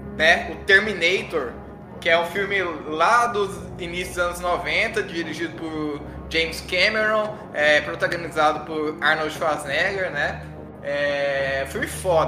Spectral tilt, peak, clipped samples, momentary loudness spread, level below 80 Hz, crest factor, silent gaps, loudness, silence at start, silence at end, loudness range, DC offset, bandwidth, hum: -3.5 dB/octave; -2 dBFS; under 0.1%; 11 LU; -44 dBFS; 20 dB; none; -22 LUFS; 0 s; 0 s; 3 LU; under 0.1%; 15.5 kHz; none